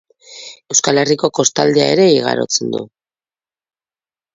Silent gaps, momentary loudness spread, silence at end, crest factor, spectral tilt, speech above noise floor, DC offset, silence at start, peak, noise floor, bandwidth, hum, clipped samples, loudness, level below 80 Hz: none; 21 LU; 1.5 s; 16 dB; -3 dB/octave; over 76 dB; under 0.1%; 0.3 s; 0 dBFS; under -90 dBFS; 7.8 kHz; none; under 0.1%; -14 LUFS; -60 dBFS